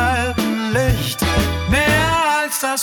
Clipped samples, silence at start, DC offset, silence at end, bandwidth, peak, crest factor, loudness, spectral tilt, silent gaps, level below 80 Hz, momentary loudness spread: under 0.1%; 0 s; under 0.1%; 0 s; over 20 kHz; -2 dBFS; 14 dB; -17 LUFS; -4 dB/octave; none; -28 dBFS; 4 LU